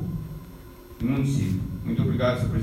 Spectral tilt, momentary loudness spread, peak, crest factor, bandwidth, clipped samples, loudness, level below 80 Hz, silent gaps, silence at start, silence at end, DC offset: -7.5 dB/octave; 20 LU; -10 dBFS; 16 dB; 15.5 kHz; under 0.1%; -26 LUFS; -42 dBFS; none; 0 s; 0 s; under 0.1%